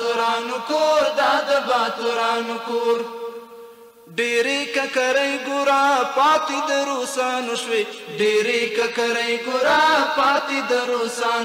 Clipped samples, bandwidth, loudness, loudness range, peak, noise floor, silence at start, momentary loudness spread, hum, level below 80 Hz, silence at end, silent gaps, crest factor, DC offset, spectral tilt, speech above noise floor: under 0.1%; 16 kHz; -20 LUFS; 3 LU; -10 dBFS; -44 dBFS; 0 s; 7 LU; none; -68 dBFS; 0 s; none; 12 dB; under 0.1%; -2 dB/octave; 24 dB